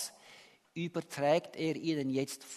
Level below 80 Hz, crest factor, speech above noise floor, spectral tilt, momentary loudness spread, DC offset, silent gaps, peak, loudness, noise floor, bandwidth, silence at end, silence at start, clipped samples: -78 dBFS; 20 dB; 25 dB; -5 dB/octave; 12 LU; under 0.1%; none; -16 dBFS; -34 LUFS; -59 dBFS; 13.5 kHz; 0 s; 0 s; under 0.1%